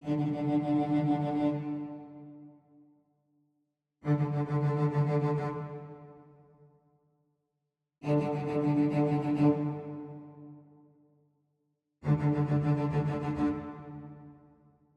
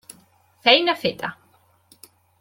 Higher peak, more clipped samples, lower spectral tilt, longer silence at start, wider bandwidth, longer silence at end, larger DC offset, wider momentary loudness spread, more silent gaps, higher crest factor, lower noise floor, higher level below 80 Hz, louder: second, -16 dBFS vs -2 dBFS; neither; first, -10 dB/octave vs -3.5 dB/octave; second, 0 s vs 0.65 s; second, 5.4 kHz vs 17 kHz; second, 0.65 s vs 1.05 s; neither; first, 20 LU vs 16 LU; neither; about the same, 18 dB vs 22 dB; first, -85 dBFS vs -60 dBFS; about the same, -64 dBFS vs -66 dBFS; second, -30 LUFS vs -19 LUFS